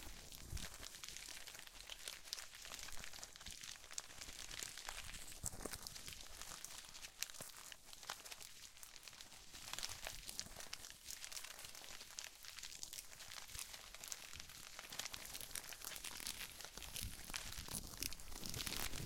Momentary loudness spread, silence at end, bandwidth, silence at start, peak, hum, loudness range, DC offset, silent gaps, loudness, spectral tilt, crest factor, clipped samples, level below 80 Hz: 7 LU; 0 s; 17 kHz; 0 s; -18 dBFS; none; 3 LU; under 0.1%; none; -50 LUFS; -1 dB/octave; 34 dB; under 0.1%; -62 dBFS